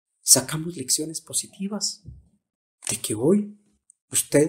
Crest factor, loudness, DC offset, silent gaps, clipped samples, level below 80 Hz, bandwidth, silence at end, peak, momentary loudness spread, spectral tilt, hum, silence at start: 24 dB; -23 LUFS; under 0.1%; 2.55-2.78 s, 4.01-4.08 s; under 0.1%; -58 dBFS; 16 kHz; 0 s; 0 dBFS; 15 LU; -3 dB/octave; none; 0.25 s